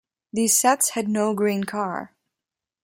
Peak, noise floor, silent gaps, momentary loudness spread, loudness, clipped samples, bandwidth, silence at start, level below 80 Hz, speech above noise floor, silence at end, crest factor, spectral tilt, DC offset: -6 dBFS; -88 dBFS; none; 12 LU; -22 LUFS; under 0.1%; 16.5 kHz; 0.35 s; -68 dBFS; 66 dB; 0.75 s; 18 dB; -3 dB/octave; under 0.1%